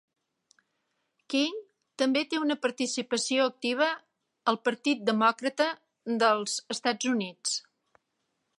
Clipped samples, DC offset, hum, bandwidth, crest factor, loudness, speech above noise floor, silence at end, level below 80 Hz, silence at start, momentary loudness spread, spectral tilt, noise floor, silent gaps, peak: under 0.1%; under 0.1%; none; 11.5 kHz; 20 dB; -28 LUFS; 52 dB; 1 s; -84 dBFS; 1.3 s; 7 LU; -2.5 dB/octave; -79 dBFS; none; -10 dBFS